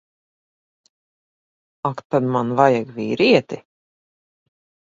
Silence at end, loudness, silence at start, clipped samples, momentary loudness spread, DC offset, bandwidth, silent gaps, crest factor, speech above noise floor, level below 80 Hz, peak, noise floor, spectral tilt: 1.3 s; -19 LUFS; 1.85 s; under 0.1%; 12 LU; under 0.1%; 7.6 kHz; 2.05-2.10 s; 22 dB; over 72 dB; -64 dBFS; 0 dBFS; under -90 dBFS; -6.5 dB/octave